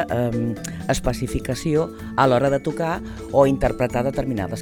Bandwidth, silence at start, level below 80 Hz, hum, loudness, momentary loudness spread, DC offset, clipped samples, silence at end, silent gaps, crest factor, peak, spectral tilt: 19.5 kHz; 0 s; -36 dBFS; none; -22 LUFS; 8 LU; under 0.1%; under 0.1%; 0 s; none; 18 dB; -4 dBFS; -6 dB/octave